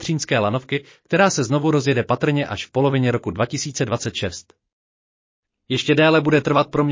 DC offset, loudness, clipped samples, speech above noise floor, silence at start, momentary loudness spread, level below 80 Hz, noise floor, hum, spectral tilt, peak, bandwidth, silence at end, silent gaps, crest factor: under 0.1%; -20 LUFS; under 0.1%; over 71 dB; 0 s; 10 LU; -50 dBFS; under -90 dBFS; none; -5 dB/octave; -4 dBFS; 7.8 kHz; 0 s; 4.73-5.43 s; 16 dB